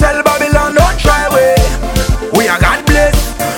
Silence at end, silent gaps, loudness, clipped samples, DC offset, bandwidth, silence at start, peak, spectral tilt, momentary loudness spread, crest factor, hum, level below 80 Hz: 0 s; none; -11 LUFS; under 0.1%; under 0.1%; 18 kHz; 0 s; 0 dBFS; -4.5 dB/octave; 5 LU; 10 dB; none; -16 dBFS